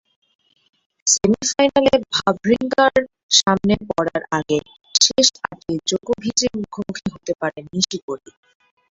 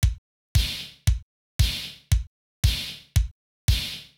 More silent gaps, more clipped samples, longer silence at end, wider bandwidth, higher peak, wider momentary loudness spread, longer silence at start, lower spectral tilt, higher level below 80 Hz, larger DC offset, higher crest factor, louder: second, 3.23-3.29 s, 8.02-8.08 s vs 0.18-0.55 s, 1.23-1.59 s, 2.27-2.63 s, 3.31-3.68 s; neither; first, 0.75 s vs 0.15 s; second, 8.2 kHz vs 19 kHz; first, 0 dBFS vs -8 dBFS; first, 13 LU vs 8 LU; first, 1.05 s vs 0 s; about the same, -2.5 dB/octave vs -3.5 dB/octave; second, -50 dBFS vs -28 dBFS; neither; about the same, 20 dB vs 16 dB; first, -18 LUFS vs -27 LUFS